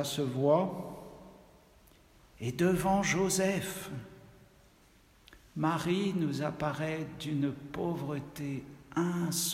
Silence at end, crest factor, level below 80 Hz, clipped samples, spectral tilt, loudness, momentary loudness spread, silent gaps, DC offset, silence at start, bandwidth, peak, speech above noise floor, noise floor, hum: 0 s; 20 dB; -60 dBFS; under 0.1%; -5 dB/octave; -32 LUFS; 15 LU; none; under 0.1%; 0 s; 16 kHz; -14 dBFS; 30 dB; -62 dBFS; none